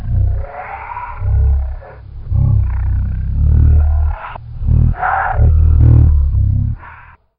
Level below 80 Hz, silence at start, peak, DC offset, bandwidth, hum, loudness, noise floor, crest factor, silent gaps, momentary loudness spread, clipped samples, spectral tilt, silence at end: -16 dBFS; 0 s; -2 dBFS; under 0.1%; 3 kHz; none; -14 LUFS; -39 dBFS; 12 dB; none; 16 LU; under 0.1%; -12 dB/octave; 0.4 s